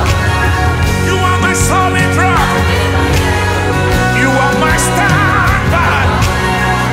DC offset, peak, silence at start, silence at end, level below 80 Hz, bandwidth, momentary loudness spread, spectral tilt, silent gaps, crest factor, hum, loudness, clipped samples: under 0.1%; 0 dBFS; 0 s; 0 s; -20 dBFS; 16.5 kHz; 2 LU; -4.5 dB/octave; none; 10 dB; none; -11 LUFS; under 0.1%